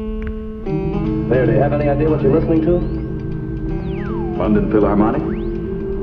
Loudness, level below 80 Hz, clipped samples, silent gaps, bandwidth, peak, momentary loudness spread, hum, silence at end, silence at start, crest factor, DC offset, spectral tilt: -18 LUFS; -28 dBFS; under 0.1%; none; 5.4 kHz; -2 dBFS; 10 LU; none; 0 s; 0 s; 14 dB; under 0.1%; -11 dB/octave